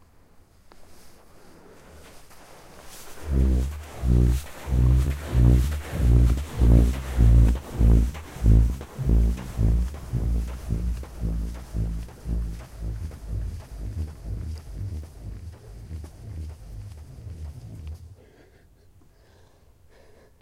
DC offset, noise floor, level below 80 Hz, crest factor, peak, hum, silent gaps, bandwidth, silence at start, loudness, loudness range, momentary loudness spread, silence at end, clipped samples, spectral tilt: under 0.1%; -55 dBFS; -26 dBFS; 20 dB; -6 dBFS; none; none; 13.5 kHz; 0.75 s; -25 LUFS; 20 LU; 20 LU; 2.3 s; under 0.1%; -7.5 dB/octave